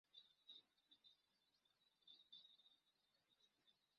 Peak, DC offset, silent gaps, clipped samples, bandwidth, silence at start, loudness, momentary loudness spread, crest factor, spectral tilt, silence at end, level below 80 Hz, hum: -52 dBFS; under 0.1%; none; under 0.1%; 6.2 kHz; 0.05 s; -66 LUFS; 4 LU; 22 dB; 1.5 dB/octave; 0 s; under -90 dBFS; none